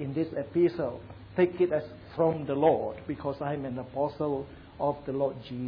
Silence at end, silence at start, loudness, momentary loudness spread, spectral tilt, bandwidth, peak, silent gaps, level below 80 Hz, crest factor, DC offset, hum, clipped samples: 0 s; 0 s; -30 LUFS; 10 LU; -10.5 dB/octave; 5.2 kHz; -12 dBFS; none; -58 dBFS; 18 dB; under 0.1%; none; under 0.1%